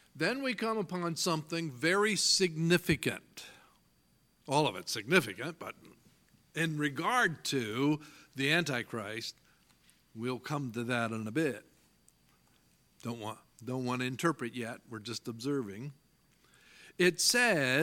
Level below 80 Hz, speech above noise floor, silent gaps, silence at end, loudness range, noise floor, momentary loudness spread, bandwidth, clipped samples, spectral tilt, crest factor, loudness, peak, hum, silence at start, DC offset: -68 dBFS; 37 dB; none; 0 s; 8 LU; -70 dBFS; 17 LU; 17.5 kHz; under 0.1%; -3.5 dB/octave; 24 dB; -32 LUFS; -10 dBFS; none; 0.15 s; under 0.1%